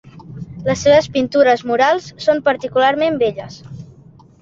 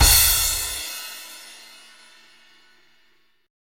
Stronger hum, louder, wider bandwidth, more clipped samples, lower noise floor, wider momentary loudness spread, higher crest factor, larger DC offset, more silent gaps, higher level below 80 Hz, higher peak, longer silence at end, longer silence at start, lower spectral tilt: neither; first, -15 LUFS vs -18 LUFS; second, 7.8 kHz vs 16.5 kHz; neither; second, -44 dBFS vs -63 dBFS; second, 21 LU vs 27 LU; second, 16 dB vs 22 dB; second, under 0.1% vs 0.1%; neither; second, -50 dBFS vs -32 dBFS; about the same, -2 dBFS vs -2 dBFS; second, 0.55 s vs 2.1 s; first, 0.25 s vs 0 s; first, -5 dB/octave vs -0.5 dB/octave